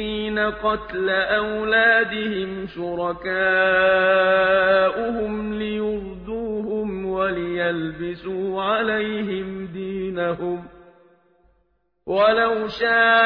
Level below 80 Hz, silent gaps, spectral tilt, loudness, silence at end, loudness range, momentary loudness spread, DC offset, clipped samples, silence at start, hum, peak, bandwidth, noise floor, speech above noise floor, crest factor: -48 dBFS; none; -7.5 dB/octave; -21 LUFS; 0 s; 7 LU; 12 LU; under 0.1%; under 0.1%; 0 s; none; -6 dBFS; 5.4 kHz; -67 dBFS; 47 dB; 16 dB